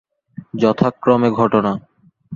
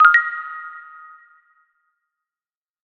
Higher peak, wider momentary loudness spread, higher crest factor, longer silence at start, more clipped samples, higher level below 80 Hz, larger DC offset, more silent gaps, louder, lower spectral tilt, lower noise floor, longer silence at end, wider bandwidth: about the same, -2 dBFS vs 0 dBFS; second, 11 LU vs 27 LU; second, 16 dB vs 22 dB; first, 0.4 s vs 0 s; neither; first, -54 dBFS vs -84 dBFS; neither; neither; about the same, -16 LUFS vs -18 LUFS; first, -8.5 dB/octave vs 0.5 dB/octave; second, -38 dBFS vs under -90 dBFS; second, 0 s vs 2.05 s; about the same, 7.2 kHz vs 6.6 kHz